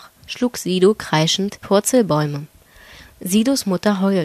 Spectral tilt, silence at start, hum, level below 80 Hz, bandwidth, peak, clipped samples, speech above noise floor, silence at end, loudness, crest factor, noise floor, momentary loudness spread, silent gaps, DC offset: -4.5 dB/octave; 0.05 s; none; -54 dBFS; 14.5 kHz; -2 dBFS; under 0.1%; 27 dB; 0 s; -18 LUFS; 16 dB; -44 dBFS; 9 LU; none; under 0.1%